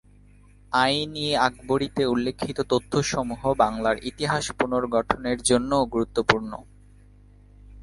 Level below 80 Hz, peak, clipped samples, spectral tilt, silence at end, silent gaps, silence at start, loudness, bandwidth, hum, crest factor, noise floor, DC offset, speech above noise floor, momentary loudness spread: -48 dBFS; 0 dBFS; under 0.1%; -4 dB/octave; 0 s; none; 0.7 s; -24 LUFS; 11.5 kHz; 50 Hz at -45 dBFS; 24 dB; -52 dBFS; under 0.1%; 28 dB; 5 LU